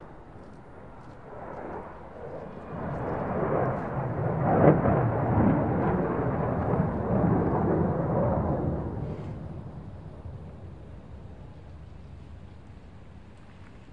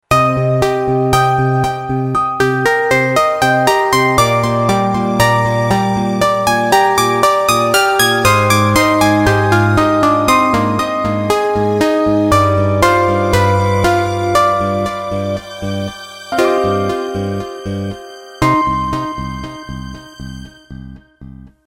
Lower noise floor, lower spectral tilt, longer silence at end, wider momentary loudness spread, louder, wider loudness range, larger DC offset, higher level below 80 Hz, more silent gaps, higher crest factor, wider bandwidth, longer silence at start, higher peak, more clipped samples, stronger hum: first, -48 dBFS vs -36 dBFS; first, -11 dB/octave vs -5 dB/octave; second, 0 s vs 0.2 s; first, 23 LU vs 13 LU; second, -27 LUFS vs -13 LUFS; first, 20 LU vs 8 LU; first, 0.2% vs under 0.1%; second, -46 dBFS vs -36 dBFS; neither; first, 24 dB vs 14 dB; second, 4.9 kHz vs 16.5 kHz; about the same, 0 s vs 0.1 s; second, -4 dBFS vs 0 dBFS; neither; neither